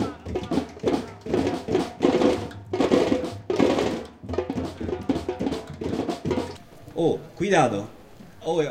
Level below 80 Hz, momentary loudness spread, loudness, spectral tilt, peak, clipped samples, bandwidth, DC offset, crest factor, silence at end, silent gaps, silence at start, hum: -48 dBFS; 11 LU; -26 LUFS; -6 dB/octave; -4 dBFS; under 0.1%; 15.5 kHz; under 0.1%; 20 dB; 0 s; none; 0 s; none